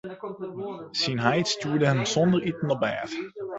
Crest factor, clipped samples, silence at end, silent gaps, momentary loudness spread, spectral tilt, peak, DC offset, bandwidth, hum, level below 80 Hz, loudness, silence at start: 20 dB; under 0.1%; 0 s; none; 13 LU; -5 dB/octave; -6 dBFS; under 0.1%; 8.2 kHz; none; -62 dBFS; -26 LUFS; 0.05 s